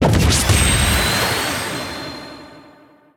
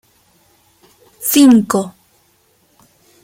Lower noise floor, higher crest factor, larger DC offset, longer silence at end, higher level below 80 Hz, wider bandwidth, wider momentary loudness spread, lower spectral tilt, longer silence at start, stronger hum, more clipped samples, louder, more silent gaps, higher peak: second, -48 dBFS vs -57 dBFS; about the same, 16 dB vs 16 dB; neither; second, 0.55 s vs 1.35 s; first, -26 dBFS vs -58 dBFS; first, 19.5 kHz vs 16.5 kHz; about the same, 16 LU vs 14 LU; about the same, -3.5 dB/octave vs -4 dB/octave; second, 0 s vs 1.2 s; neither; neither; second, -16 LUFS vs -12 LUFS; neither; about the same, -2 dBFS vs 0 dBFS